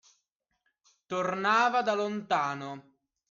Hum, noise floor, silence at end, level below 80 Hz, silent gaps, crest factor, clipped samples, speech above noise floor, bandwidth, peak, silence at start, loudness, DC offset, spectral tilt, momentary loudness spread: none; -80 dBFS; 0.5 s; -78 dBFS; none; 18 dB; under 0.1%; 51 dB; 7.6 kHz; -12 dBFS; 1.1 s; -29 LUFS; under 0.1%; -4.5 dB/octave; 15 LU